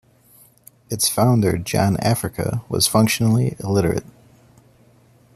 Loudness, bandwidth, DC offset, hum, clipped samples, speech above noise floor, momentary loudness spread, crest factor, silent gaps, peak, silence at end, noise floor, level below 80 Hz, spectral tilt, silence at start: -19 LUFS; 15 kHz; under 0.1%; none; under 0.1%; 34 dB; 8 LU; 20 dB; none; -2 dBFS; 1.35 s; -53 dBFS; -48 dBFS; -5 dB/octave; 0.9 s